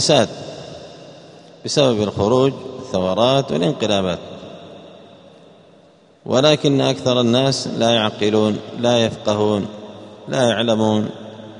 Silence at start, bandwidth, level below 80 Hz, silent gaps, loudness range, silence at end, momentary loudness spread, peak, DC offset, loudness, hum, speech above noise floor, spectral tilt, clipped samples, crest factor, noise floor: 0 s; 10.5 kHz; -56 dBFS; none; 4 LU; 0 s; 20 LU; 0 dBFS; under 0.1%; -18 LUFS; none; 33 dB; -5 dB/octave; under 0.1%; 18 dB; -50 dBFS